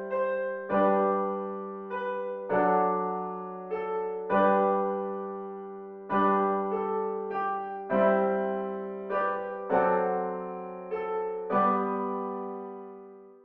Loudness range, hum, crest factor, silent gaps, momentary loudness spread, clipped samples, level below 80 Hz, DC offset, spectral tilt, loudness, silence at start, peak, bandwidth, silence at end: 2 LU; none; 16 dB; none; 13 LU; under 0.1%; -70 dBFS; under 0.1%; -6 dB/octave; -29 LUFS; 0 s; -12 dBFS; 4.4 kHz; 0.1 s